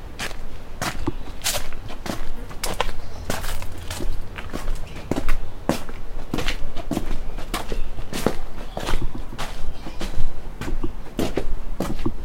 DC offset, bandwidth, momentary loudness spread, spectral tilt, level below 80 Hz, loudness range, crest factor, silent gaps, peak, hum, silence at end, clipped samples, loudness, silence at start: under 0.1%; 15.5 kHz; 8 LU; -4 dB/octave; -26 dBFS; 2 LU; 18 dB; none; 0 dBFS; none; 0 s; under 0.1%; -30 LUFS; 0 s